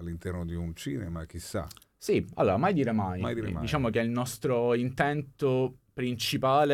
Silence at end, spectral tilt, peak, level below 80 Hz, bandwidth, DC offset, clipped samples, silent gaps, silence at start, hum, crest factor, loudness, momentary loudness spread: 0 s; -6 dB/octave; -12 dBFS; -52 dBFS; 17 kHz; under 0.1%; under 0.1%; none; 0 s; none; 18 dB; -30 LUFS; 11 LU